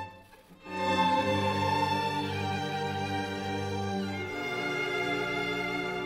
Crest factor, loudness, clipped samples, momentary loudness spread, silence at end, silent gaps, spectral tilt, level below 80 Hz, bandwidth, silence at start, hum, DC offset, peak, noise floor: 18 dB; -30 LUFS; under 0.1%; 7 LU; 0 s; none; -5 dB/octave; -62 dBFS; 16 kHz; 0 s; none; under 0.1%; -14 dBFS; -54 dBFS